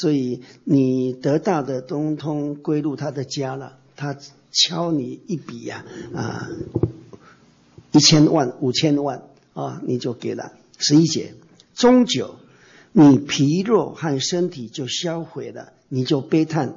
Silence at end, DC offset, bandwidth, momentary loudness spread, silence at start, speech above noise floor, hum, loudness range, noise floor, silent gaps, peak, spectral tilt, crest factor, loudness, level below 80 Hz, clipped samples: 0 s; under 0.1%; 7.8 kHz; 18 LU; 0 s; 32 dB; none; 7 LU; -52 dBFS; none; -4 dBFS; -5 dB/octave; 16 dB; -20 LUFS; -56 dBFS; under 0.1%